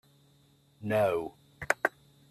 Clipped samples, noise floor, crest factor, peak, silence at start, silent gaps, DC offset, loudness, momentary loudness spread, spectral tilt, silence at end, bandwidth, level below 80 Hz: under 0.1%; -64 dBFS; 26 dB; -8 dBFS; 0.8 s; none; under 0.1%; -30 LUFS; 16 LU; -5 dB/octave; 0.4 s; 14.5 kHz; -66 dBFS